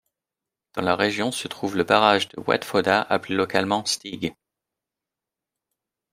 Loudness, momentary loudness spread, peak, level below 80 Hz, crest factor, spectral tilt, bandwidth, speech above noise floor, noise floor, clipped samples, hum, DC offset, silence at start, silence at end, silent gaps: -23 LUFS; 11 LU; -2 dBFS; -64 dBFS; 24 dB; -3.5 dB/octave; 16 kHz; 65 dB; -88 dBFS; under 0.1%; none; under 0.1%; 0.75 s; 1.8 s; none